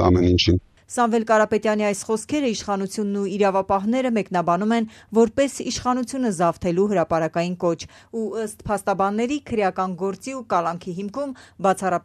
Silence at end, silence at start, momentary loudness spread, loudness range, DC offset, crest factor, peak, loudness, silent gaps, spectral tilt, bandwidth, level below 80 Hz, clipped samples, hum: 0.05 s; 0 s; 10 LU; 3 LU; under 0.1%; 18 dB; -4 dBFS; -22 LUFS; none; -5.5 dB/octave; 13.5 kHz; -46 dBFS; under 0.1%; none